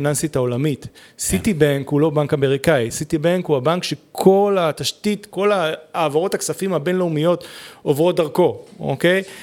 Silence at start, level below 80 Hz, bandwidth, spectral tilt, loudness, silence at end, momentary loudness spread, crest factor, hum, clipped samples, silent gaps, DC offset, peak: 0 s; -48 dBFS; 18 kHz; -5 dB/octave; -19 LUFS; 0 s; 7 LU; 18 dB; none; under 0.1%; none; under 0.1%; 0 dBFS